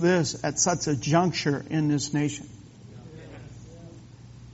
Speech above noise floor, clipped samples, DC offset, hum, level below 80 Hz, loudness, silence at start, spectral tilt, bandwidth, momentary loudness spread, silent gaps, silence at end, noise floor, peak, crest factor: 21 dB; under 0.1%; under 0.1%; none; -56 dBFS; -25 LUFS; 0 s; -5.5 dB/octave; 8 kHz; 23 LU; none; 0 s; -46 dBFS; -8 dBFS; 20 dB